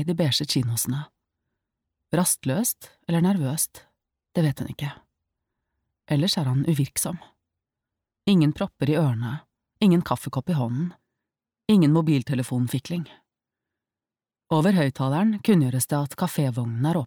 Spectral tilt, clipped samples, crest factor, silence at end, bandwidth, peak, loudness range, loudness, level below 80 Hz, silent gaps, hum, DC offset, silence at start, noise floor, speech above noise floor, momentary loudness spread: -5.5 dB/octave; under 0.1%; 16 dB; 0 s; 19.5 kHz; -8 dBFS; 4 LU; -24 LUFS; -60 dBFS; none; none; under 0.1%; 0 s; under -90 dBFS; over 67 dB; 12 LU